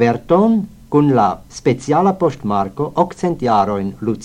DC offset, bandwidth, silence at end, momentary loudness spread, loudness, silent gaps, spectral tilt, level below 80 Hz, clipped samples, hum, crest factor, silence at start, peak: under 0.1%; 10.5 kHz; 0 s; 6 LU; -16 LUFS; none; -7.5 dB/octave; -46 dBFS; under 0.1%; none; 14 dB; 0 s; -2 dBFS